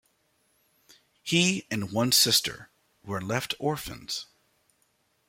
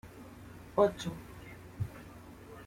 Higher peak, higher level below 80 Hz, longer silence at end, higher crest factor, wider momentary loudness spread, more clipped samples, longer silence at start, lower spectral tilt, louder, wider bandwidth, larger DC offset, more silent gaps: first, -8 dBFS vs -14 dBFS; about the same, -62 dBFS vs -58 dBFS; first, 1.05 s vs 0 s; about the same, 22 dB vs 24 dB; second, 15 LU vs 21 LU; neither; first, 1.25 s vs 0.05 s; second, -3 dB/octave vs -6.5 dB/octave; first, -26 LUFS vs -34 LUFS; about the same, 16.5 kHz vs 16.5 kHz; neither; neither